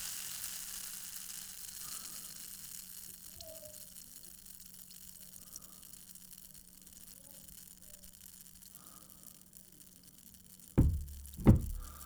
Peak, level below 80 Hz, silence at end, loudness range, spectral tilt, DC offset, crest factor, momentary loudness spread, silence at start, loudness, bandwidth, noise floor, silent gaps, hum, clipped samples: -12 dBFS; -46 dBFS; 0 s; 16 LU; -5.5 dB/octave; under 0.1%; 28 dB; 21 LU; 0 s; -39 LUFS; over 20 kHz; -58 dBFS; none; none; under 0.1%